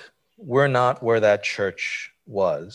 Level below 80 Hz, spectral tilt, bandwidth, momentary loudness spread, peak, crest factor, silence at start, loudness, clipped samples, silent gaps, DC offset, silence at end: -62 dBFS; -5.5 dB/octave; 10.5 kHz; 9 LU; -6 dBFS; 16 dB; 0 s; -22 LUFS; under 0.1%; none; under 0.1%; 0 s